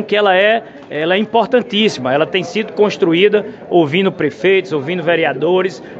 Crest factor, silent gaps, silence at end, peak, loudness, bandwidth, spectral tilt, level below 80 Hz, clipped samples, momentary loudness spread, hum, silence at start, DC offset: 14 dB; none; 0 s; 0 dBFS; -14 LUFS; 8 kHz; -5.5 dB/octave; -62 dBFS; under 0.1%; 6 LU; none; 0 s; under 0.1%